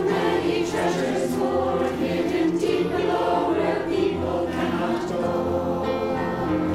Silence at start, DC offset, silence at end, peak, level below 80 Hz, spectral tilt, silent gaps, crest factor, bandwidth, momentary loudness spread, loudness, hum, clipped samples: 0 s; under 0.1%; 0 s; -10 dBFS; -48 dBFS; -6 dB/octave; none; 12 dB; 14.5 kHz; 3 LU; -24 LUFS; none; under 0.1%